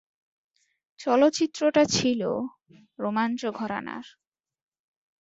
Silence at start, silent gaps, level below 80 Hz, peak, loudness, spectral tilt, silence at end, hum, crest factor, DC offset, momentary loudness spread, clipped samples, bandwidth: 1 s; none; -64 dBFS; -8 dBFS; -25 LUFS; -4 dB/octave; 1.15 s; none; 20 dB; under 0.1%; 13 LU; under 0.1%; 8 kHz